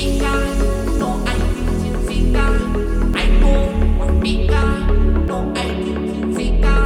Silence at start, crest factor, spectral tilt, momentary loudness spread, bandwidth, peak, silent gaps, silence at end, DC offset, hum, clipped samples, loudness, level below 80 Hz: 0 s; 12 dB; -6.5 dB/octave; 4 LU; 12 kHz; -2 dBFS; none; 0 s; under 0.1%; none; under 0.1%; -19 LUFS; -16 dBFS